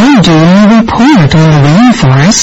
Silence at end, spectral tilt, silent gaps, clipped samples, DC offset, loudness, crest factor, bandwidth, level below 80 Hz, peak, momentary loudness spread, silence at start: 0 s; -5.5 dB/octave; none; 2%; under 0.1%; -4 LUFS; 4 dB; 8.2 kHz; -28 dBFS; 0 dBFS; 2 LU; 0 s